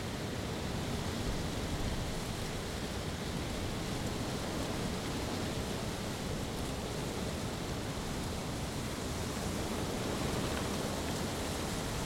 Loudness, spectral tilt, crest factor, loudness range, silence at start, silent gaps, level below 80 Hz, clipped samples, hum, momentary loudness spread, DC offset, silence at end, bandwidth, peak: -37 LUFS; -4.5 dB/octave; 14 dB; 2 LU; 0 s; none; -46 dBFS; under 0.1%; none; 3 LU; under 0.1%; 0 s; 16 kHz; -22 dBFS